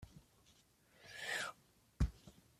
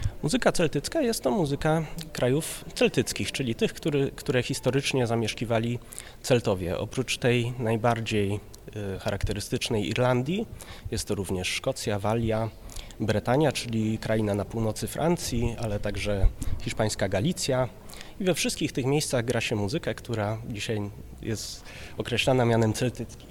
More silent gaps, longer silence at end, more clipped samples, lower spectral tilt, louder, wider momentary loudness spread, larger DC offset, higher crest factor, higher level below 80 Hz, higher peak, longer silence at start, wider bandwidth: neither; first, 0.3 s vs 0 s; neither; about the same, -4 dB/octave vs -5 dB/octave; second, -44 LUFS vs -27 LUFS; first, 21 LU vs 10 LU; neither; about the same, 22 dB vs 20 dB; second, -50 dBFS vs -40 dBFS; second, -24 dBFS vs -8 dBFS; about the same, 0 s vs 0 s; second, 15 kHz vs 17.5 kHz